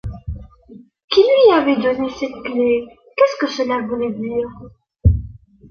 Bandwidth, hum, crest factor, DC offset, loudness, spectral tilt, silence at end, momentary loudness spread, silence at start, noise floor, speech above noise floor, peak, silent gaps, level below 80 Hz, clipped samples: 6.8 kHz; none; 16 dB; under 0.1%; -17 LUFS; -7 dB/octave; 0.4 s; 18 LU; 0.05 s; -44 dBFS; 27 dB; -2 dBFS; 1.04-1.08 s; -30 dBFS; under 0.1%